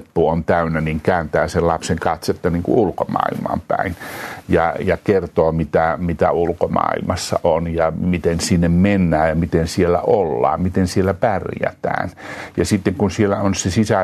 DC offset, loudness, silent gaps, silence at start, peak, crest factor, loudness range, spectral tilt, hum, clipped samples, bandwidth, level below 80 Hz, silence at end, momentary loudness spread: under 0.1%; -18 LUFS; none; 0 s; -2 dBFS; 14 dB; 3 LU; -6 dB/octave; none; under 0.1%; 13.5 kHz; -42 dBFS; 0 s; 6 LU